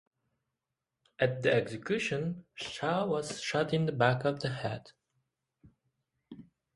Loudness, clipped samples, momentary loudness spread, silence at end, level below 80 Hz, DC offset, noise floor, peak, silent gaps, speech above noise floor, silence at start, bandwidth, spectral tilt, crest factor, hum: -32 LUFS; under 0.1%; 10 LU; 0.35 s; -68 dBFS; under 0.1%; -88 dBFS; -12 dBFS; none; 57 dB; 1.2 s; 11.5 kHz; -5.5 dB/octave; 22 dB; none